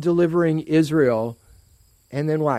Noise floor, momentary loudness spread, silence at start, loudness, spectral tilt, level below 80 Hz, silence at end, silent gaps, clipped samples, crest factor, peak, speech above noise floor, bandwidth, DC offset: -56 dBFS; 10 LU; 0 s; -20 LUFS; -8 dB/octave; -56 dBFS; 0 s; none; under 0.1%; 14 dB; -6 dBFS; 37 dB; 13.5 kHz; under 0.1%